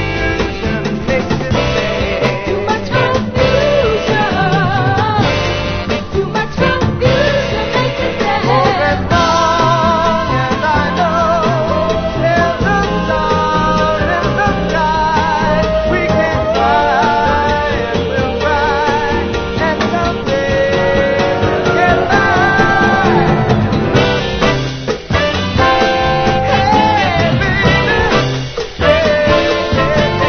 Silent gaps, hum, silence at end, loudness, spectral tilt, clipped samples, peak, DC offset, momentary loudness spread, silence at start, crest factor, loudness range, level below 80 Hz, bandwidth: none; none; 0 s; -13 LUFS; -6 dB/octave; under 0.1%; 0 dBFS; under 0.1%; 5 LU; 0 s; 12 dB; 3 LU; -26 dBFS; 6.8 kHz